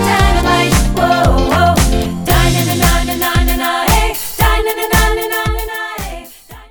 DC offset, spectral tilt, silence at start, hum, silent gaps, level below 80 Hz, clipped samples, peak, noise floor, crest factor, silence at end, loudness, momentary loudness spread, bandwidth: 0.2%; -4.5 dB/octave; 0 s; none; none; -18 dBFS; under 0.1%; 0 dBFS; -35 dBFS; 12 dB; 0.05 s; -13 LUFS; 9 LU; over 20 kHz